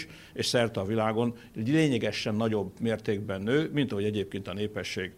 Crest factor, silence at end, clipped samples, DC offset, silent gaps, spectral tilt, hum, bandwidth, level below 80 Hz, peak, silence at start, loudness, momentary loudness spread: 18 dB; 0.05 s; under 0.1%; under 0.1%; none; -5.5 dB/octave; none; 16 kHz; -62 dBFS; -12 dBFS; 0 s; -29 LUFS; 8 LU